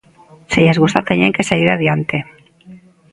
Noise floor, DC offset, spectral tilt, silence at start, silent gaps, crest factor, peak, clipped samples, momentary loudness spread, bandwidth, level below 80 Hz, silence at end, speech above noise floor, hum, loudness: -45 dBFS; under 0.1%; -6 dB/octave; 0.5 s; none; 16 dB; 0 dBFS; under 0.1%; 10 LU; 11.5 kHz; -46 dBFS; 0.35 s; 31 dB; none; -14 LUFS